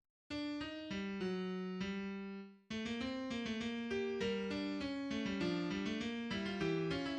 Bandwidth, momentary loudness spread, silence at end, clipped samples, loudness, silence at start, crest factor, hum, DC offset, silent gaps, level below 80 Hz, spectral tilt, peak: 9.4 kHz; 6 LU; 0 s; under 0.1%; -41 LUFS; 0.3 s; 14 dB; none; under 0.1%; none; -66 dBFS; -6 dB/octave; -26 dBFS